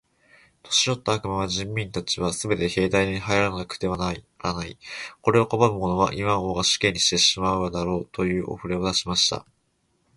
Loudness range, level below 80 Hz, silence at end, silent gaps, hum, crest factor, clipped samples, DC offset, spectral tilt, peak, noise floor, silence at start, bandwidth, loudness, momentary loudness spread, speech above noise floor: 4 LU; -46 dBFS; 0.75 s; none; none; 22 dB; under 0.1%; under 0.1%; -3.5 dB/octave; -2 dBFS; -69 dBFS; 0.65 s; 11.5 kHz; -23 LUFS; 10 LU; 45 dB